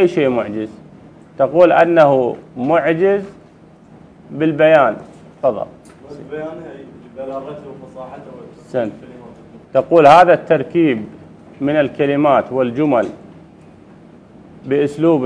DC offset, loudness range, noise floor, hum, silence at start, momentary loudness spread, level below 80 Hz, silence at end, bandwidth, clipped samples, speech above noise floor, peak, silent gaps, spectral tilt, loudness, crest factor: under 0.1%; 14 LU; -44 dBFS; none; 0 s; 23 LU; -56 dBFS; 0 s; 10.5 kHz; 0.2%; 29 dB; 0 dBFS; none; -7.5 dB/octave; -14 LUFS; 16 dB